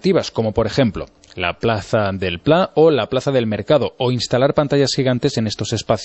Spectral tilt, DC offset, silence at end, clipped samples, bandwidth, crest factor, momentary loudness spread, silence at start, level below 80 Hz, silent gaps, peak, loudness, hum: -5.5 dB/octave; under 0.1%; 0 s; under 0.1%; 8.4 kHz; 16 dB; 7 LU; 0.05 s; -44 dBFS; none; -2 dBFS; -18 LUFS; none